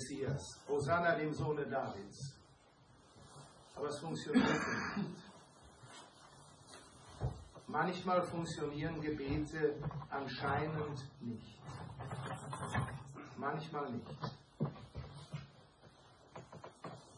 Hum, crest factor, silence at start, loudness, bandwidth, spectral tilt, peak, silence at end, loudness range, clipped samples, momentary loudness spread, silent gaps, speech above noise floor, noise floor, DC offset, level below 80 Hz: none; 22 dB; 0 s; -40 LUFS; 11 kHz; -6 dB/octave; -18 dBFS; 0 s; 6 LU; under 0.1%; 22 LU; none; 26 dB; -65 dBFS; under 0.1%; -62 dBFS